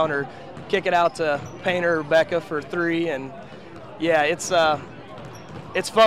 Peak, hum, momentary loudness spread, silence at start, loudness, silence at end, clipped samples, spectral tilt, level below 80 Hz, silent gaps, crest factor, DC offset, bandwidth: -6 dBFS; none; 19 LU; 0 s; -22 LUFS; 0 s; under 0.1%; -4 dB/octave; -58 dBFS; none; 16 dB; 0.4%; 14.5 kHz